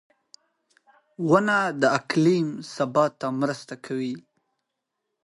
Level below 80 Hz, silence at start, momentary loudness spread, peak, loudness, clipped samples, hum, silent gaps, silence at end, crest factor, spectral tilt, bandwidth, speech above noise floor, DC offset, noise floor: -70 dBFS; 1.2 s; 12 LU; -6 dBFS; -24 LUFS; under 0.1%; none; none; 1.05 s; 20 dB; -6 dB/octave; 11.5 kHz; 58 dB; under 0.1%; -81 dBFS